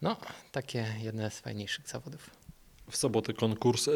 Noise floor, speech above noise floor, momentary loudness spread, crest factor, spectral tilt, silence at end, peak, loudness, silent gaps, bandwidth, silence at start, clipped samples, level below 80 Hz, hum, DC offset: -54 dBFS; 21 dB; 14 LU; 20 dB; -4.5 dB/octave; 0 s; -14 dBFS; -34 LUFS; none; 19.5 kHz; 0 s; under 0.1%; -64 dBFS; none; under 0.1%